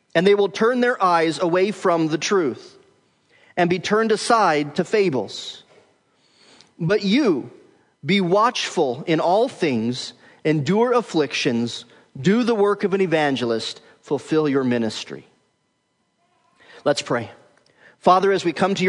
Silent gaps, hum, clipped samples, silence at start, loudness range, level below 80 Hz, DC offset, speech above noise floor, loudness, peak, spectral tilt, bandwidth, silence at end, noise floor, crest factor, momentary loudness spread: none; none; under 0.1%; 0.15 s; 5 LU; -70 dBFS; under 0.1%; 50 dB; -20 LUFS; -2 dBFS; -5 dB/octave; 10.5 kHz; 0 s; -69 dBFS; 18 dB; 13 LU